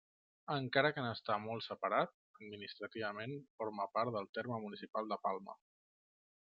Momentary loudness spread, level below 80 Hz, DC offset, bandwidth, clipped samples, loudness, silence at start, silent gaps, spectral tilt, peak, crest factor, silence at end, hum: 14 LU; -86 dBFS; under 0.1%; 7 kHz; under 0.1%; -40 LUFS; 0.5 s; 2.14-2.34 s, 3.50-3.58 s, 4.29-4.33 s, 4.89-4.93 s; -3 dB/octave; -16 dBFS; 24 dB; 0.9 s; none